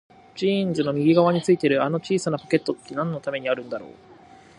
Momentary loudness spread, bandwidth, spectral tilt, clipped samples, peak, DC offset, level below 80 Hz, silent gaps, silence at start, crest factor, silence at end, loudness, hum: 10 LU; 11 kHz; -6.5 dB/octave; under 0.1%; -4 dBFS; under 0.1%; -64 dBFS; none; 0.35 s; 18 dB; 0.7 s; -23 LUFS; none